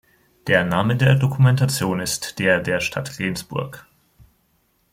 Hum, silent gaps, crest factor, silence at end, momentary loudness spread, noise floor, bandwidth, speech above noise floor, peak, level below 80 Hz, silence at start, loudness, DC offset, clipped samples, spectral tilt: none; none; 18 dB; 1.1 s; 11 LU; -65 dBFS; 16 kHz; 45 dB; -4 dBFS; -52 dBFS; 0.45 s; -20 LUFS; under 0.1%; under 0.1%; -5.5 dB/octave